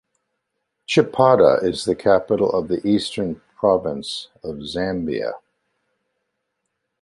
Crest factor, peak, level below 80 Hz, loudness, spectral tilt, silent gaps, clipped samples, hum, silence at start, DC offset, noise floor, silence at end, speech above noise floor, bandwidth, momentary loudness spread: 20 dB; -2 dBFS; -52 dBFS; -20 LUFS; -5.5 dB/octave; none; under 0.1%; none; 0.9 s; under 0.1%; -77 dBFS; 1.65 s; 57 dB; 11.5 kHz; 14 LU